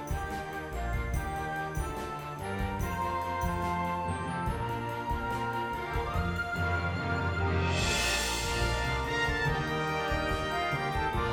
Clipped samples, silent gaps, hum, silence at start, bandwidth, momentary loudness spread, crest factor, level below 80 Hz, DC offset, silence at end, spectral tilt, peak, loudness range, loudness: under 0.1%; none; none; 0 s; over 20 kHz; 7 LU; 14 dB; -40 dBFS; under 0.1%; 0 s; -4.5 dB/octave; -16 dBFS; 4 LU; -32 LUFS